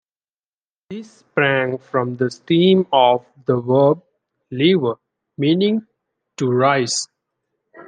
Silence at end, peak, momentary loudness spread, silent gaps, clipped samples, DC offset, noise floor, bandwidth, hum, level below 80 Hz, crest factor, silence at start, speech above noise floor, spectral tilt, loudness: 0.05 s; -2 dBFS; 18 LU; none; under 0.1%; under 0.1%; under -90 dBFS; 10 kHz; none; -68 dBFS; 18 dB; 0.9 s; over 73 dB; -5 dB/octave; -18 LUFS